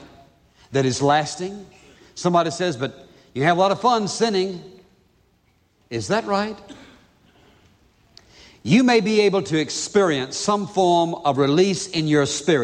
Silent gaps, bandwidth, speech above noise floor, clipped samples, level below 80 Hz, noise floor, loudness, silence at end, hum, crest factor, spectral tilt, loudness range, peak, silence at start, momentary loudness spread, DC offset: none; 10.5 kHz; 42 dB; under 0.1%; -60 dBFS; -62 dBFS; -20 LUFS; 0 s; none; 18 dB; -4.5 dB/octave; 10 LU; -4 dBFS; 0 s; 13 LU; under 0.1%